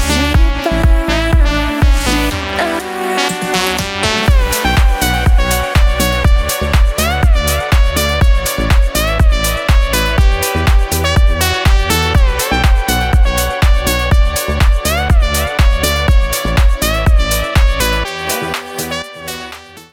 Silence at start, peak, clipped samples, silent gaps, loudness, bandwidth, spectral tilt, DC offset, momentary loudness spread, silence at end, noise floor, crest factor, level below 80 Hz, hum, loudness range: 0 s; 0 dBFS; under 0.1%; none; -13 LUFS; 17.5 kHz; -4 dB/octave; under 0.1%; 4 LU; 0.1 s; -31 dBFS; 12 dB; -14 dBFS; none; 2 LU